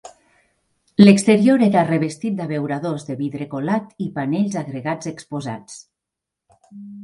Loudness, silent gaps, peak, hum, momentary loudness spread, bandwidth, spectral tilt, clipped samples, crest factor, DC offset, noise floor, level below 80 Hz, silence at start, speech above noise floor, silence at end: -19 LUFS; none; 0 dBFS; none; 16 LU; 11.5 kHz; -6.5 dB/octave; under 0.1%; 20 dB; under 0.1%; -84 dBFS; -60 dBFS; 0.05 s; 66 dB; 0 s